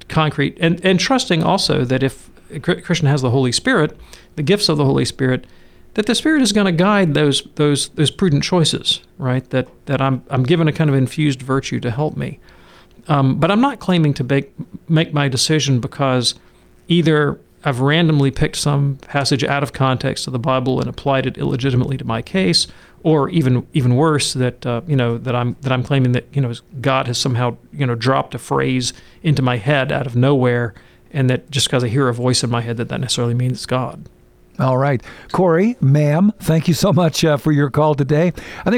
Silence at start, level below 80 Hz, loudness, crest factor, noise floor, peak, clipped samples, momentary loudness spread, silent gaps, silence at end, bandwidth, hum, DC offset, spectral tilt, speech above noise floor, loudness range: 0.1 s; -44 dBFS; -17 LUFS; 14 dB; -45 dBFS; -4 dBFS; under 0.1%; 8 LU; none; 0 s; 15 kHz; none; under 0.1%; -5.5 dB/octave; 28 dB; 3 LU